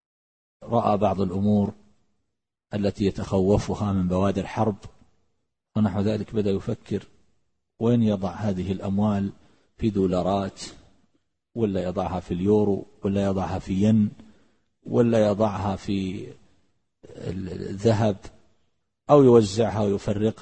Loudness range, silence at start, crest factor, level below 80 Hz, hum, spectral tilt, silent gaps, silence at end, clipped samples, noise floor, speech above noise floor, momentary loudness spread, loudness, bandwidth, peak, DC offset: 5 LU; 0.6 s; 20 dB; -50 dBFS; none; -8 dB/octave; none; 0 s; under 0.1%; -81 dBFS; 58 dB; 12 LU; -24 LUFS; 8.8 kHz; -4 dBFS; 0.1%